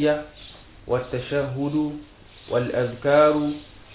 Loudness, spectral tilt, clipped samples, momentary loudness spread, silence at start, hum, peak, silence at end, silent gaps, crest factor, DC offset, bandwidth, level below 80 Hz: -23 LUFS; -10.5 dB/octave; under 0.1%; 23 LU; 0 s; none; -6 dBFS; 0 s; none; 18 dB; under 0.1%; 4 kHz; -50 dBFS